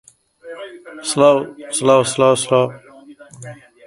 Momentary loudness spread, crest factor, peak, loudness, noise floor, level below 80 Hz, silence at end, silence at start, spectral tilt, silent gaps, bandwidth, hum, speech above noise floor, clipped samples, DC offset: 23 LU; 18 dB; 0 dBFS; -16 LUFS; -41 dBFS; -60 dBFS; 0.35 s; 0.45 s; -4 dB/octave; none; 11.5 kHz; none; 26 dB; under 0.1%; under 0.1%